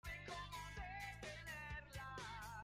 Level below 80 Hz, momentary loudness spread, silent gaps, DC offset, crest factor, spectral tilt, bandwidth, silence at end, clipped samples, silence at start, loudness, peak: -60 dBFS; 1 LU; none; under 0.1%; 12 dB; -3.5 dB/octave; 16 kHz; 0 s; under 0.1%; 0.05 s; -51 LUFS; -38 dBFS